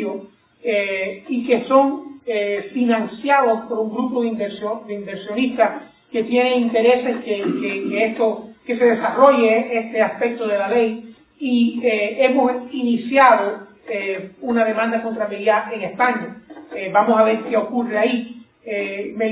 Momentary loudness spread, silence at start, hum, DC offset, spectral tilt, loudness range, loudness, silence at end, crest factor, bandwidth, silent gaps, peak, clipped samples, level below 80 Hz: 13 LU; 0 s; none; under 0.1%; -9 dB/octave; 3 LU; -19 LUFS; 0 s; 18 dB; 4 kHz; none; 0 dBFS; under 0.1%; -64 dBFS